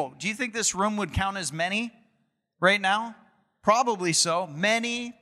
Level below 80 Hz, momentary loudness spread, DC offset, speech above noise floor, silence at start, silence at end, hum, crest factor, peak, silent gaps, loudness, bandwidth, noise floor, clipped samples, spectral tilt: -52 dBFS; 7 LU; under 0.1%; 47 dB; 0 s; 0.1 s; none; 20 dB; -6 dBFS; none; -25 LUFS; 15.5 kHz; -73 dBFS; under 0.1%; -2.5 dB/octave